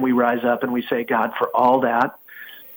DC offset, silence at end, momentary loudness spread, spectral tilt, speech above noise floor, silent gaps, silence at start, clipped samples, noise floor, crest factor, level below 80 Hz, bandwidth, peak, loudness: under 0.1%; 0 s; 16 LU; -7.5 dB/octave; 21 dB; none; 0 s; under 0.1%; -40 dBFS; 16 dB; -68 dBFS; 19 kHz; -6 dBFS; -20 LUFS